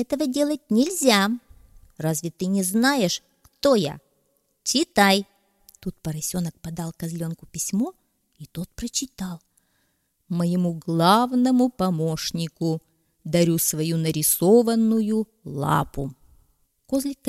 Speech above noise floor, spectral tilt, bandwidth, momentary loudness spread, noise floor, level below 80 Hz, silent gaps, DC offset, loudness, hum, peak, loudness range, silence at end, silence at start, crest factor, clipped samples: 48 dB; -4.5 dB/octave; 16 kHz; 15 LU; -70 dBFS; -52 dBFS; none; under 0.1%; -23 LUFS; none; -2 dBFS; 9 LU; 0 s; 0 s; 22 dB; under 0.1%